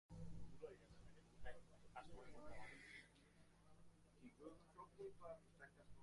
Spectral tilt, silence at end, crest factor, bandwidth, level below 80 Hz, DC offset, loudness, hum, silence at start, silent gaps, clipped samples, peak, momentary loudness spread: -5.5 dB/octave; 0 s; 18 dB; 11.5 kHz; -70 dBFS; under 0.1%; -62 LUFS; none; 0.1 s; none; under 0.1%; -40 dBFS; 9 LU